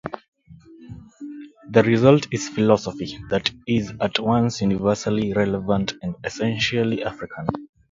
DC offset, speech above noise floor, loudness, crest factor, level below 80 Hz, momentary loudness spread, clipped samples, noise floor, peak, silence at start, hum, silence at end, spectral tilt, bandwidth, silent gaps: under 0.1%; 26 dB; -22 LUFS; 22 dB; -50 dBFS; 20 LU; under 0.1%; -47 dBFS; 0 dBFS; 0.05 s; none; 0.25 s; -6 dB/octave; 7.8 kHz; 0.28-0.32 s